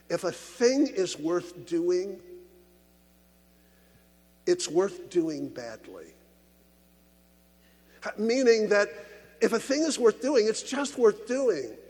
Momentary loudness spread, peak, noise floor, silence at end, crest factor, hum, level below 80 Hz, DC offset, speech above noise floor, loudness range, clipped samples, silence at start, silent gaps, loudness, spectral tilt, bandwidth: 16 LU; -10 dBFS; -61 dBFS; 0.1 s; 18 dB; none; -68 dBFS; under 0.1%; 34 dB; 9 LU; under 0.1%; 0.1 s; none; -27 LUFS; -3.5 dB/octave; 19 kHz